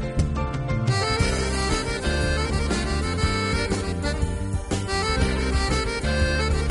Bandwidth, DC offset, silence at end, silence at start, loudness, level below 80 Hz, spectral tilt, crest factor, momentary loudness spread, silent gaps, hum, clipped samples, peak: 11.5 kHz; under 0.1%; 0 s; 0 s; -24 LUFS; -28 dBFS; -5 dB/octave; 14 dB; 4 LU; none; none; under 0.1%; -10 dBFS